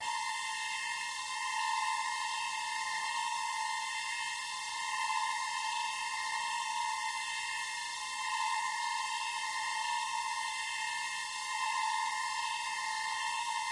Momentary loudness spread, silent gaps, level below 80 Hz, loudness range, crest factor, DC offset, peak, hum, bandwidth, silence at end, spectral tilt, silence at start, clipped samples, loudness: 3 LU; none; -78 dBFS; 0 LU; 14 dB; under 0.1%; -22 dBFS; none; 11.5 kHz; 0 s; 3 dB/octave; 0 s; under 0.1%; -35 LUFS